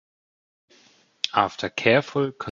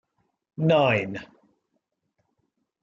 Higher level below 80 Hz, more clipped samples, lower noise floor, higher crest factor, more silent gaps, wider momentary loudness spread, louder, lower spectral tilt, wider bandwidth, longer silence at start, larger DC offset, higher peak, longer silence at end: first, -62 dBFS vs -68 dBFS; neither; second, -58 dBFS vs -77 dBFS; about the same, 24 dB vs 20 dB; neither; second, 7 LU vs 19 LU; about the same, -23 LUFS vs -23 LUFS; second, -5 dB/octave vs -7.5 dB/octave; about the same, 7.6 kHz vs 7.4 kHz; first, 1.25 s vs 0.6 s; neither; first, -2 dBFS vs -8 dBFS; second, 0 s vs 1.6 s